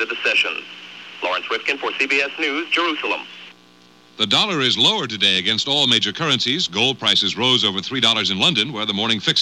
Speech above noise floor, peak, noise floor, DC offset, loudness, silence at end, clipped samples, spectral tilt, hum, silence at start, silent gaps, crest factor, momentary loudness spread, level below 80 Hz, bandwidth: 30 dB; -2 dBFS; -50 dBFS; under 0.1%; -17 LUFS; 0 s; under 0.1%; -2.5 dB/octave; none; 0 s; none; 18 dB; 8 LU; -64 dBFS; 14.5 kHz